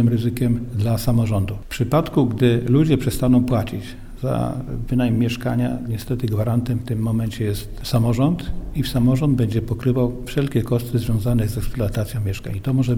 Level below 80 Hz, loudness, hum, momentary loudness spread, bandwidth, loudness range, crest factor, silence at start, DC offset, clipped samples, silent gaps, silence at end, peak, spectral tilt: -34 dBFS; -21 LUFS; none; 8 LU; 17 kHz; 3 LU; 16 dB; 0 s; under 0.1%; under 0.1%; none; 0 s; -4 dBFS; -7.5 dB/octave